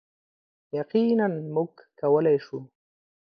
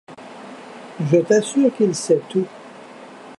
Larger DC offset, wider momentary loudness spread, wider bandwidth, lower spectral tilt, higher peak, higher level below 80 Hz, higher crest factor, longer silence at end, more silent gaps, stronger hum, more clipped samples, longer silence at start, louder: neither; second, 13 LU vs 24 LU; second, 5.4 kHz vs 11.5 kHz; first, -9.5 dB/octave vs -6 dB/octave; second, -10 dBFS vs -4 dBFS; second, -78 dBFS vs -72 dBFS; about the same, 16 dB vs 18 dB; first, 0.55 s vs 0 s; neither; neither; neither; first, 0.75 s vs 0.1 s; second, -25 LUFS vs -19 LUFS